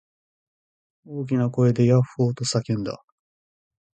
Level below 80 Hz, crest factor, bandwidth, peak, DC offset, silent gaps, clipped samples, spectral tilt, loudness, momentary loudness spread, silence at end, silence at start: -58 dBFS; 18 dB; 9.4 kHz; -6 dBFS; under 0.1%; none; under 0.1%; -6.5 dB/octave; -22 LUFS; 14 LU; 1 s; 1.1 s